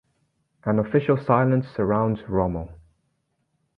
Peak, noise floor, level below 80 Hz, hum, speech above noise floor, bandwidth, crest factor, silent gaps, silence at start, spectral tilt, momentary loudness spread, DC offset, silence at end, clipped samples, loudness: -4 dBFS; -73 dBFS; -46 dBFS; none; 51 dB; 5.2 kHz; 20 dB; none; 0.65 s; -11 dB/octave; 11 LU; under 0.1%; 1.05 s; under 0.1%; -23 LUFS